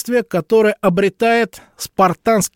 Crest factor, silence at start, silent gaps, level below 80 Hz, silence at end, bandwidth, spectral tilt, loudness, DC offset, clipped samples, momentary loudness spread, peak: 14 dB; 0.05 s; none; -52 dBFS; 0.1 s; 17 kHz; -5 dB/octave; -16 LUFS; under 0.1%; under 0.1%; 9 LU; -2 dBFS